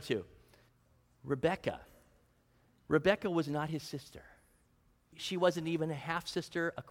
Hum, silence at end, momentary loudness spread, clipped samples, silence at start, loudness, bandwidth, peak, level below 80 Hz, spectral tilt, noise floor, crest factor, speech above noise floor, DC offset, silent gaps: none; 0 s; 18 LU; under 0.1%; 0 s; -35 LUFS; 16.5 kHz; -14 dBFS; -66 dBFS; -5.5 dB/octave; -70 dBFS; 22 dB; 36 dB; under 0.1%; none